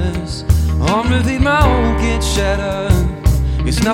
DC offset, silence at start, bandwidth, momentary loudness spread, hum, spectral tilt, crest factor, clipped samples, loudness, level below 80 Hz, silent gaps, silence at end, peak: under 0.1%; 0 s; 16 kHz; 5 LU; none; -5.5 dB/octave; 14 dB; under 0.1%; -15 LUFS; -18 dBFS; none; 0 s; 0 dBFS